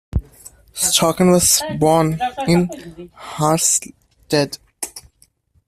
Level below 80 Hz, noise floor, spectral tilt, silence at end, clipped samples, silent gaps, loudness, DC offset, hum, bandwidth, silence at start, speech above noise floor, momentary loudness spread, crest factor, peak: -38 dBFS; -57 dBFS; -4 dB/octave; 0.65 s; under 0.1%; none; -16 LUFS; under 0.1%; none; 15 kHz; 0.15 s; 40 dB; 18 LU; 18 dB; 0 dBFS